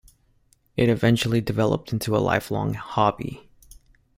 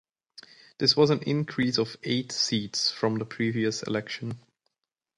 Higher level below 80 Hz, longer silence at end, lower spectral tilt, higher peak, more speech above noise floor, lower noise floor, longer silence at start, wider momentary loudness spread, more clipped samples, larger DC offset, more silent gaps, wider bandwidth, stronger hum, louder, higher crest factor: first, -50 dBFS vs -66 dBFS; about the same, 0.8 s vs 0.8 s; first, -6.5 dB/octave vs -4.5 dB/octave; first, -4 dBFS vs -8 dBFS; second, 40 dB vs 59 dB; second, -62 dBFS vs -86 dBFS; about the same, 0.75 s vs 0.8 s; first, 13 LU vs 10 LU; neither; neither; neither; first, 16 kHz vs 11.5 kHz; neither; first, -23 LUFS vs -26 LUFS; about the same, 20 dB vs 20 dB